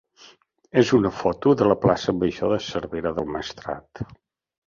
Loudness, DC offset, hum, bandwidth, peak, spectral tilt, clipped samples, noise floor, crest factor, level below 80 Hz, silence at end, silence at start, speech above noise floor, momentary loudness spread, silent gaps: -22 LUFS; under 0.1%; none; 7.4 kHz; -4 dBFS; -6.5 dB/octave; under 0.1%; -54 dBFS; 20 dB; -50 dBFS; 0.65 s; 0.75 s; 32 dB; 15 LU; none